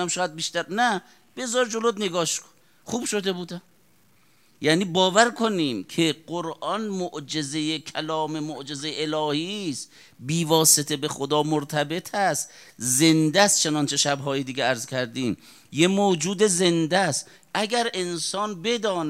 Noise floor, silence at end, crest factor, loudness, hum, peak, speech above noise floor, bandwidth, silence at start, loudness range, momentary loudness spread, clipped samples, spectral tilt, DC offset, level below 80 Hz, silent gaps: -62 dBFS; 0 s; 24 dB; -23 LUFS; none; -2 dBFS; 37 dB; 16 kHz; 0 s; 6 LU; 13 LU; under 0.1%; -3 dB/octave; under 0.1%; -72 dBFS; none